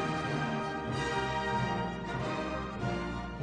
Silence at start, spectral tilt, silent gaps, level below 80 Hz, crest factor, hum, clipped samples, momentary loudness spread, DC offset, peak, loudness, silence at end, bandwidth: 0 s; -6 dB/octave; none; -48 dBFS; 14 dB; none; under 0.1%; 4 LU; under 0.1%; -20 dBFS; -34 LUFS; 0 s; 10 kHz